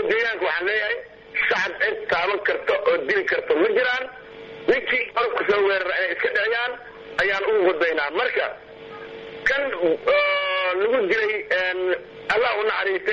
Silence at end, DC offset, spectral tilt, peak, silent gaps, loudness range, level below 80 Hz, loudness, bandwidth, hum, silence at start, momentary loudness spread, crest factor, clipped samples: 0 s; under 0.1%; -4 dB/octave; -6 dBFS; none; 1 LU; -58 dBFS; -22 LUFS; 7.6 kHz; none; 0 s; 9 LU; 16 dB; under 0.1%